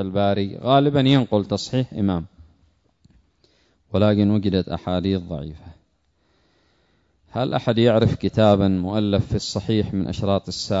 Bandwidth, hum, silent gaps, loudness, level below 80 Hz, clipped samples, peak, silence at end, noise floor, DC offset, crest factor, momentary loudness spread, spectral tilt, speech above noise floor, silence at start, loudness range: 8 kHz; none; none; -21 LUFS; -46 dBFS; under 0.1%; -4 dBFS; 0 s; -66 dBFS; under 0.1%; 18 dB; 10 LU; -7 dB/octave; 46 dB; 0 s; 5 LU